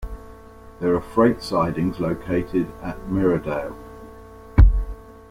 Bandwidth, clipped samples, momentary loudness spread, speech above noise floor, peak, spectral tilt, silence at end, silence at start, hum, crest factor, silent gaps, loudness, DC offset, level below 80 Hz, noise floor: 11 kHz; under 0.1%; 22 LU; 21 dB; -2 dBFS; -8.5 dB/octave; 0.2 s; 0 s; none; 20 dB; none; -22 LUFS; under 0.1%; -26 dBFS; -43 dBFS